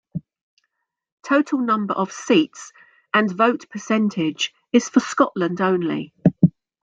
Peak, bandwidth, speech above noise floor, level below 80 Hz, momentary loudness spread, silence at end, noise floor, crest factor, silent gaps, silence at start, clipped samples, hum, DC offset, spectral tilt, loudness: -2 dBFS; 9 kHz; 55 dB; -62 dBFS; 10 LU; 0.35 s; -76 dBFS; 18 dB; 0.41-0.57 s, 1.12-1.17 s; 0.15 s; under 0.1%; none; under 0.1%; -5.5 dB/octave; -20 LUFS